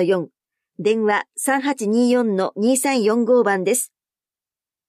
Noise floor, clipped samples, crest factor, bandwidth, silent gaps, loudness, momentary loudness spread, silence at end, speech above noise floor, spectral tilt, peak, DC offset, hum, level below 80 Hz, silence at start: under -90 dBFS; under 0.1%; 12 dB; 15.5 kHz; none; -19 LUFS; 6 LU; 1.05 s; over 72 dB; -4 dB/octave; -8 dBFS; under 0.1%; none; -76 dBFS; 0 s